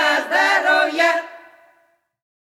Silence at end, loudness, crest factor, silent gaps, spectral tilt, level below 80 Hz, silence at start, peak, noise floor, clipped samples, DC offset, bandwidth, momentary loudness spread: 1.2 s; -16 LUFS; 16 dB; none; -0.5 dB/octave; -84 dBFS; 0 s; -4 dBFS; -61 dBFS; under 0.1%; under 0.1%; 15.5 kHz; 8 LU